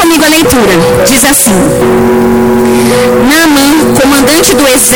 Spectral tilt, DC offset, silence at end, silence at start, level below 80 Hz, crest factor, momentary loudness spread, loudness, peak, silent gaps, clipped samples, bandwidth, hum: -3.5 dB/octave; under 0.1%; 0 s; 0 s; -28 dBFS; 6 dB; 3 LU; -5 LUFS; 0 dBFS; none; 0.3%; over 20 kHz; none